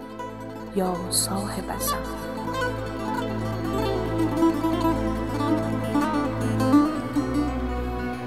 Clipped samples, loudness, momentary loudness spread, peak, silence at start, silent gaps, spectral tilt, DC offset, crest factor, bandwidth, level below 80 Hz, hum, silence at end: under 0.1%; -25 LUFS; 8 LU; -8 dBFS; 0 s; none; -5 dB/octave; 0.4%; 18 dB; 15.5 kHz; -38 dBFS; none; 0 s